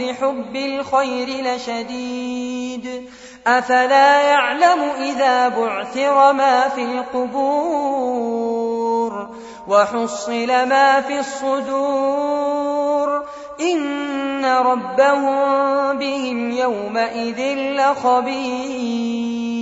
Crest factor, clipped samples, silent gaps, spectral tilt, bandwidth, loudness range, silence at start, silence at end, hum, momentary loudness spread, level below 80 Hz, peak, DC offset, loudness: 16 dB; under 0.1%; none; -3.5 dB/octave; 8 kHz; 5 LU; 0 s; 0 s; none; 11 LU; -60 dBFS; -2 dBFS; under 0.1%; -18 LUFS